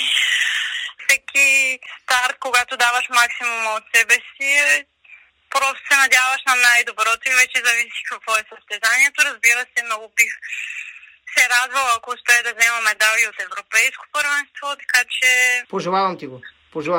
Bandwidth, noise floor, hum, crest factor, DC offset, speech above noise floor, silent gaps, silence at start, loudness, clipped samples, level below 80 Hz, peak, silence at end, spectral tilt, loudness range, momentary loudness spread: 16.5 kHz; -48 dBFS; none; 18 dB; under 0.1%; 30 dB; none; 0 s; -16 LUFS; under 0.1%; -68 dBFS; 0 dBFS; 0 s; 0.5 dB/octave; 2 LU; 11 LU